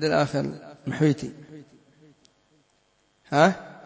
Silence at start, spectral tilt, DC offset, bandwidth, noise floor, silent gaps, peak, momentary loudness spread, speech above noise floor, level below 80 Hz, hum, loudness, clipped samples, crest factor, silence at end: 0 s; -6 dB/octave; under 0.1%; 8 kHz; -67 dBFS; none; -6 dBFS; 18 LU; 44 dB; -62 dBFS; none; -24 LUFS; under 0.1%; 20 dB; 0.1 s